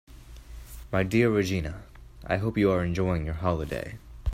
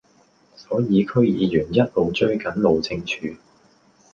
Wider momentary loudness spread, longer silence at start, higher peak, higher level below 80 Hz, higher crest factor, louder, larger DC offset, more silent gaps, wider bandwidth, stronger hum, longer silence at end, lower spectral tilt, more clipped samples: first, 22 LU vs 8 LU; second, 0.1 s vs 0.6 s; second, -10 dBFS vs -4 dBFS; first, -42 dBFS vs -50 dBFS; about the same, 18 dB vs 18 dB; second, -27 LUFS vs -21 LUFS; neither; neither; first, 16 kHz vs 7.2 kHz; neither; second, 0 s vs 0.8 s; about the same, -7 dB/octave vs -7 dB/octave; neither